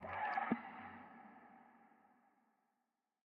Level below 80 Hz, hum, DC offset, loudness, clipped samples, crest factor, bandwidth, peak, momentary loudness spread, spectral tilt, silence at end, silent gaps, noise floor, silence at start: -90 dBFS; none; under 0.1%; -43 LUFS; under 0.1%; 24 dB; 5.2 kHz; -24 dBFS; 23 LU; -4 dB/octave; 1.5 s; none; -89 dBFS; 0 s